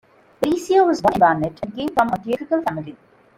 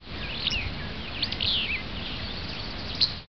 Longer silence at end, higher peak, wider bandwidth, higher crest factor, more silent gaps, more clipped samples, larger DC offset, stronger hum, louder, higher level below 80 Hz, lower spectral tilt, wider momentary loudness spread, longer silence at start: first, 0.45 s vs 0 s; first, -2 dBFS vs -8 dBFS; first, 16.5 kHz vs 6.4 kHz; second, 18 dB vs 24 dB; neither; neither; second, under 0.1% vs 0.8%; neither; first, -19 LUFS vs -29 LUFS; second, -52 dBFS vs -42 dBFS; first, -6 dB/octave vs -1.5 dB/octave; about the same, 11 LU vs 9 LU; first, 0.4 s vs 0 s